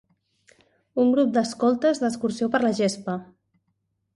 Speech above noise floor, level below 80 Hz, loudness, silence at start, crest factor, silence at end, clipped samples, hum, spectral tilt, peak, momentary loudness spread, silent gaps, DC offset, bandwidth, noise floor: 52 dB; -68 dBFS; -23 LUFS; 0.95 s; 16 dB; 0.9 s; under 0.1%; none; -5.5 dB/octave; -8 dBFS; 11 LU; none; under 0.1%; 11.5 kHz; -74 dBFS